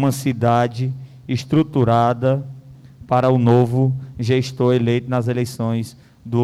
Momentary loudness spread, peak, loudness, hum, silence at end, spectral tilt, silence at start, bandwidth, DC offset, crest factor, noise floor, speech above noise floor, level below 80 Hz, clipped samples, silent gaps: 10 LU; -6 dBFS; -19 LUFS; none; 0 s; -7.5 dB/octave; 0 s; 13.5 kHz; under 0.1%; 12 dB; -41 dBFS; 24 dB; -52 dBFS; under 0.1%; none